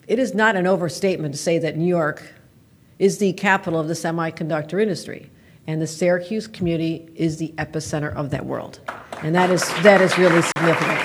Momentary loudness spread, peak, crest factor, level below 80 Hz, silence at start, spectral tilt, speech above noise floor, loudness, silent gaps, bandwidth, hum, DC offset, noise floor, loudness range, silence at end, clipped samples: 14 LU; 0 dBFS; 20 dB; -54 dBFS; 0.1 s; -5 dB/octave; 32 dB; -20 LUFS; none; over 20 kHz; none; under 0.1%; -52 dBFS; 6 LU; 0 s; under 0.1%